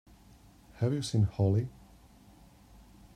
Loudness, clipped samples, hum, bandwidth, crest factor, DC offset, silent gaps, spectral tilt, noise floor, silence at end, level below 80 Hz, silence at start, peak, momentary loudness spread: -31 LUFS; under 0.1%; none; 11.5 kHz; 18 dB; under 0.1%; none; -7 dB/octave; -58 dBFS; 1.45 s; -58 dBFS; 0.75 s; -16 dBFS; 6 LU